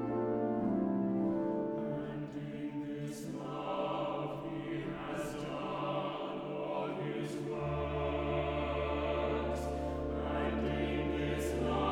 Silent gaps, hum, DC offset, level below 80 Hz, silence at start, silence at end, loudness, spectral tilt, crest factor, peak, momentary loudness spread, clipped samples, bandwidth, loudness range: none; none; under 0.1%; -48 dBFS; 0 s; 0 s; -37 LUFS; -7 dB/octave; 14 dB; -22 dBFS; 7 LU; under 0.1%; 18.5 kHz; 4 LU